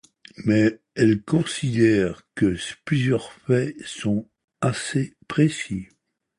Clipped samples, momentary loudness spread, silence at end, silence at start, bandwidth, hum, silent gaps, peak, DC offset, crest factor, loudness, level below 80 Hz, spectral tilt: under 0.1%; 10 LU; 0.55 s; 0.4 s; 11.5 kHz; none; 4.44-4.48 s; -6 dBFS; under 0.1%; 18 dB; -23 LUFS; -52 dBFS; -6 dB/octave